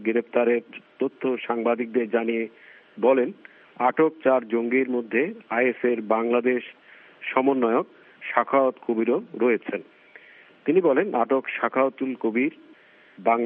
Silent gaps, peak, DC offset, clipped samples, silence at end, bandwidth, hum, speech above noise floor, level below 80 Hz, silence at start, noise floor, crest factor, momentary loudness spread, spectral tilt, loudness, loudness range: none; -2 dBFS; under 0.1%; under 0.1%; 0 s; 3.8 kHz; none; 30 dB; -82 dBFS; 0 s; -53 dBFS; 22 dB; 8 LU; -4 dB/octave; -24 LUFS; 2 LU